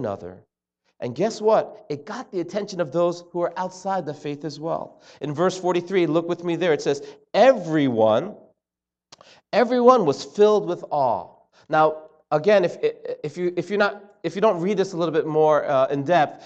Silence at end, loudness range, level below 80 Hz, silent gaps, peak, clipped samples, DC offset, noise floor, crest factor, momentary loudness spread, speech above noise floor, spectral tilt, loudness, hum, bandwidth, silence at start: 0 s; 6 LU; -72 dBFS; none; -2 dBFS; under 0.1%; under 0.1%; -89 dBFS; 20 dB; 14 LU; 67 dB; -6 dB/octave; -22 LUFS; none; 8.4 kHz; 0 s